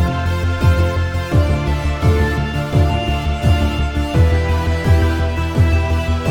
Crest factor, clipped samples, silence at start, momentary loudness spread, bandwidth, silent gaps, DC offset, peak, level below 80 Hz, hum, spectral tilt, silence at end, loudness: 12 dB; under 0.1%; 0 s; 4 LU; 14 kHz; none; under 0.1%; -2 dBFS; -20 dBFS; none; -7 dB/octave; 0 s; -17 LUFS